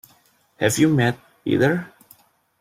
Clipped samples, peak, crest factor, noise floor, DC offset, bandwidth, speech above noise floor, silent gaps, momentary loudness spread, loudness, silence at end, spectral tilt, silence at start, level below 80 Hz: under 0.1%; -4 dBFS; 18 dB; -59 dBFS; under 0.1%; 16.5 kHz; 40 dB; none; 12 LU; -21 LUFS; 0.75 s; -5.5 dB/octave; 0.6 s; -58 dBFS